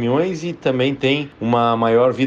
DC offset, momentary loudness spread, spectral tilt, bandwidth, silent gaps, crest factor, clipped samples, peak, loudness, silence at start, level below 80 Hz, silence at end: under 0.1%; 6 LU; -6.5 dB/octave; 7.8 kHz; none; 12 dB; under 0.1%; -4 dBFS; -18 LUFS; 0 s; -54 dBFS; 0 s